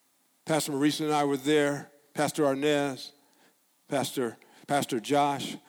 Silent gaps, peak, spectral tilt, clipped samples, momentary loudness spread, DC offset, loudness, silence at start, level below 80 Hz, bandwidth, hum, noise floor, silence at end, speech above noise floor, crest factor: none; -14 dBFS; -4.5 dB/octave; under 0.1%; 11 LU; under 0.1%; -28 LUFS; 0.45 s; -78 dBFS; 19 kHz; none; -65 dBFS; 0.1 s; 38 dB; 16 dB